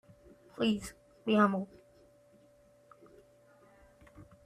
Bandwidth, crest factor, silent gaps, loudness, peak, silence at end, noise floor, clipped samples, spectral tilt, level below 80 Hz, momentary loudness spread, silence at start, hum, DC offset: 14 kHz; 22 dB; none; -31 LUFS; -14 dBFS; 0.25 s; -63 dBFS; under 0.1%; -6 dB/octave; -66 dBFS; 20 LU; 0.6 s; none; under 0.1%